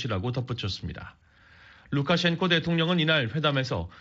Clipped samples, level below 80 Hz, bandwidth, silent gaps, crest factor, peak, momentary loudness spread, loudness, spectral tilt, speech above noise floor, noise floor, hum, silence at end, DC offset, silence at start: under 0.1%; -52 dBFS; 7.8 kHz; none; 18 dB; -8 dBFS; 12 LU; -26 LUFS; -4 dB/octave; 28 dB; -54 dBFS; none; 0.05 s; under 0.1%; 0 s